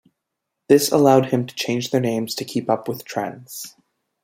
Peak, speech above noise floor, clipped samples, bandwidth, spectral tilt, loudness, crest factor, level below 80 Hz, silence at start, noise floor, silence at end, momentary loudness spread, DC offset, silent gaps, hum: -2 dBFS; 60 dB; under 0.1%; 16 kHz; -5 dB/octave; -20 LUFS; 18 dB; -64 dBFS; 0.7 s; -80 dBFS; 0.55 s; 18 LU; under 0.1%; none; none